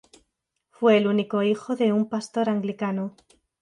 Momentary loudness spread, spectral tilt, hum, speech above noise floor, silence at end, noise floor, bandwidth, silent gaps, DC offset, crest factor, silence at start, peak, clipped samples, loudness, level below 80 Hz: 8 LU; -6.5 dB/octave; none; 55 dB; 0.5 s; -78 dBFS; 10.5 kHz; none; under 0.1%; 18 dB; 0.8 s; -8 dBFS; under 0.1%; -24 LUFS; -72 dBFS